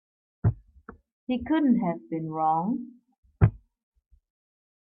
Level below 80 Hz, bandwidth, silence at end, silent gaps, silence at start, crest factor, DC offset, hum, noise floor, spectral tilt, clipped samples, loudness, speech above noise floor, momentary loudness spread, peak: -46 dBFS; 4.1 kHz; 1.25 s; 1.12-1.27 s, 3.18-3.23 s; 0.45 s; 22 dB; under 0.1%; none; -51 dBFS; -12 dB/octave; under 0.1%; -27 LUFS; 25 dB; 12 LU; -8 dBFS